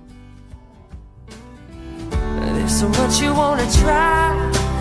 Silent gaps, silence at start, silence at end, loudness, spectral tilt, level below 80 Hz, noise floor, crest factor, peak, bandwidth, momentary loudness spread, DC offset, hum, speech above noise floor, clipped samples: none; 0.05 s; 0 s; -17 LUFS; -4.5 dB/octave; -26 dBFS; -41 dBFS; 16 dB; -4 dBFS; 11 kHz; 22 LU; under 0.1%; none; 26 dB; under 0.1%